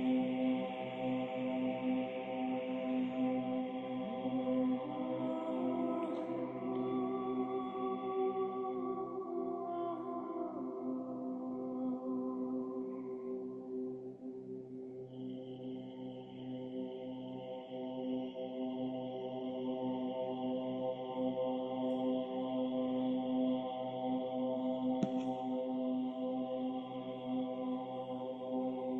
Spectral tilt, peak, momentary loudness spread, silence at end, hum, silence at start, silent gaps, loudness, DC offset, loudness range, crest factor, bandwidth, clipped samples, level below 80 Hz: -8.5 dB/octave; -20 dBFS; 9 LU; 0 s; none; 0 s; none; -39 LUFS; under 0.1%; 7 LU; 18 dB; 4 kHz; under 0.1%; -78 dBFS